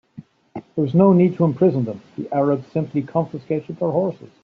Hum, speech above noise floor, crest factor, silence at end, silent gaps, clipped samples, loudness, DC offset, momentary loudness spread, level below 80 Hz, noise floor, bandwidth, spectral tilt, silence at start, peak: none; 24 dB; 16 dB; 0.15 s; none; under 0.1%; -20 LUFS; under 0.1%; 14 LU; -62 dBFS; -43 dBFS; 5 kHz; -10 dB/octave; 0.2 s; -2 dBFS